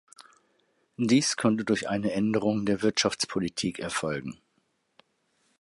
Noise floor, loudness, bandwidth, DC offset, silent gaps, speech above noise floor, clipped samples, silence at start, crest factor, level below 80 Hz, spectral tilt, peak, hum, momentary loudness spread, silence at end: -73 dBFS; -27 LUFS; 11.5 kHz; under 0.1%; none; 46 dB; under 0.1%; 1 s; 20 dB; -62 dBFS; -4 dB/octave; -10 dBFS; none; 8 LU; 1.25 s